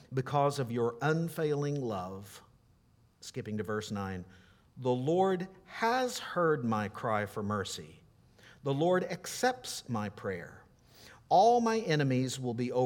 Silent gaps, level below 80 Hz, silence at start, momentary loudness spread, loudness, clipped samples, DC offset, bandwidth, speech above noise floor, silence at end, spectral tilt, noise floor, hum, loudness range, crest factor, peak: none; -70 dBFS; 0.1 s; 13 LU; -32 LUFS; under 0.1%; under 0.1%; 18.5 kHz; 34 dB; 0 s; -5.5 dB/octave; -66 dBFS; none; 6 LU; 18 dB; -14 dBFS